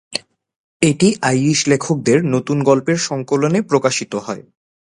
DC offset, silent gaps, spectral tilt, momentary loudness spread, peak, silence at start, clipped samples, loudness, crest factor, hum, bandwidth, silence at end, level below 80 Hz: under 0.1%; 0.56-0.80 s; -5 dB/octave; 11 LU; 0 dBFS; 0.1 s; under 0.1%; -16 LUFS; 16 dB; none; 11.5 kHz; 0.55 s; -56 dBFS